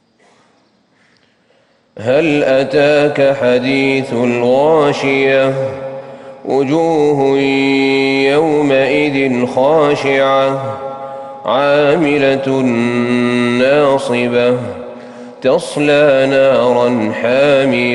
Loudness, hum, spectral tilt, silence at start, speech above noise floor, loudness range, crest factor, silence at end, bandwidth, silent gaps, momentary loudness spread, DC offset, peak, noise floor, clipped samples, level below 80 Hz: -12 LUFS; none; -6 dB/octave; 1.95 s; 42 dB; 2 LU; 10 dB; 0 s; 11.5 kHz; none; 12 LU; under 0.1%; -2 dBFS; -54 dBFS; under 0.1%; -54 dBFS